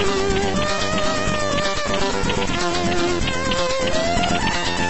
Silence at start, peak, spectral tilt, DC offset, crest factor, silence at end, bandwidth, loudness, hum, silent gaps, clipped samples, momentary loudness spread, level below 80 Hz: 0 s; -6 dBFS; -4 dB/octave; 4%; 14 dB; 0 s; 8.4 kHz; -21 LUFS; none; none; under 0.1%; 1 LU; -32 dBFS